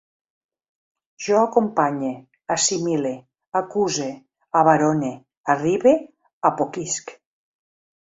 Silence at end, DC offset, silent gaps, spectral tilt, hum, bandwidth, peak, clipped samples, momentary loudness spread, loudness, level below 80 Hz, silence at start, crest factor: 0.9 s; under 0.1%; 3.48-3.52 s, 5.37-5.44 s, 6.33-6.41 s; -4 dB/octave; none; 8 kHz; -2 dBFS; under 0.1%; 14 LU; -21 LUFS; -66 dBFS; 1.2 s; 20 dB